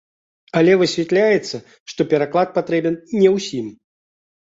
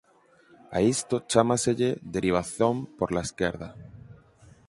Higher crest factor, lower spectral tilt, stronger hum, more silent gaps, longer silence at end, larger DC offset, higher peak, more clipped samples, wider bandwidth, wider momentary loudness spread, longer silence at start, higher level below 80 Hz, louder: second, 16 dB vs 24 dB; about the same, -5.5 dB/octave vs -5 dB/octave; neither; first, 1.80-1.86 s vs none; first, 0.9 s vs 0.55 s; neither; about the same, -2 dBFS vs -4 dBFS; neither; second, 7.8 kHz vs 11.5 kHz; about the same, 15 LU vs 14 LU; second, 0.55 s vs 0.7 s; second, -62 dBFS vs -52 dBFS; first, -18 LUFS vs -26 LUFS